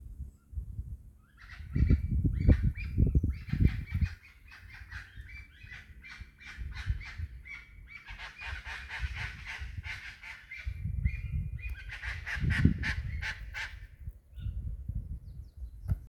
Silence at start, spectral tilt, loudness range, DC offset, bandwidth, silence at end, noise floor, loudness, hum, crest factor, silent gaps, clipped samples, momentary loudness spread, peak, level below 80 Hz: 0 s; -7 dB/octave; 13 LU; under 0.1%; 12 kHz; 0 s; -54 dBFS; -35 LUFS; none; 26 dB; none; under 0.1%; 20 LU; -8 dBFS; -38 dBFS